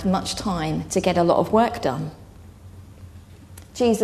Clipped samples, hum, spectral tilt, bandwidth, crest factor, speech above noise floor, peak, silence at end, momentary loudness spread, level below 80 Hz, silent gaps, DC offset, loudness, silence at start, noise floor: under 0.1%; none; -5.5 dB/octave; 13.5 kHz; 18 dB; 23 dB; -4 dBFS; 0 s; 23 LU; -46 dBFS; none; under 0.1%; -22 LUFS; 0 s; -44 dBFS